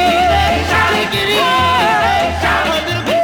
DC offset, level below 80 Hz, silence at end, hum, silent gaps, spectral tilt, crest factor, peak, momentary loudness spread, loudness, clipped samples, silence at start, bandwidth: under 0.1%; -32 dBFS; 0 s; none; none; -4 dB/octave; 10 dB; -2 dBFS; 3 LU; -13 LUFS; under 0.1%; 0 s; over 20 kHz